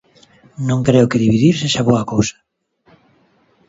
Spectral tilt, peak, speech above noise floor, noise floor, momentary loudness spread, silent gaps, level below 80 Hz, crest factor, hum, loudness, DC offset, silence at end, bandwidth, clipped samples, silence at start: -6 dB/octave; 0 dBFS; 42 dB; -56 dBFS; 7 LU; none; -46 dBFS; 16 dB; none; -15 LUFS; under 0.1%; 1.4 s; 8 kHz; under 0.1%; 0.6 s